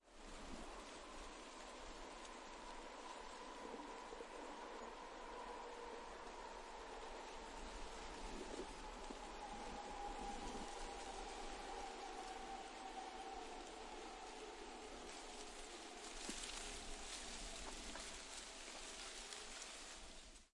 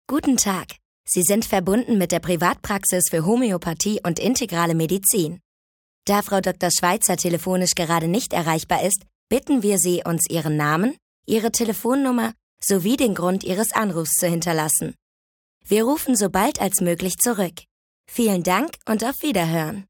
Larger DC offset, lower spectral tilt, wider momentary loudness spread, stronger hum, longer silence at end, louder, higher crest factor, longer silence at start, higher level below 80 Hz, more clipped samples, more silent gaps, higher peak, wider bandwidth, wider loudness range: neither; second, -2 dB/octave vs -4 dB/octave; about the same, 5 LU vs 6 LU; neither; about the same, 0.1 s vs 0.05 s; second, -52 LUFS vs -21 LUFS; about the same, 18 dB vs 20 dB; about the same, 0.05 s vs 0.1 s; second, -60 dBFS vs -52 dBFS; neither; second, none vs 0.85-1.04 s, 5.45-6.02 s, 9.15-9.27 s, 11.02-11.23 s, 12.43-12.57 s, 15.02-15.61 s, 17.71-18.04 s; second, -34 dBFS vs -2 dBFS; second, 11.5 kHz vs 19.5 kHz; about the same, 3 LU vs 1 LU